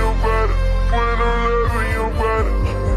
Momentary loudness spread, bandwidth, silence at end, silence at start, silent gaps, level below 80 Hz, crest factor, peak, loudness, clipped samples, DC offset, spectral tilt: 2 LU; 12 kHz; 0 s; 0 s; none; -20 dBFS; 10 dB; -6 dBFS; -19 LUFS; under 0.1%; under 0.1%; -6.5 dB/octave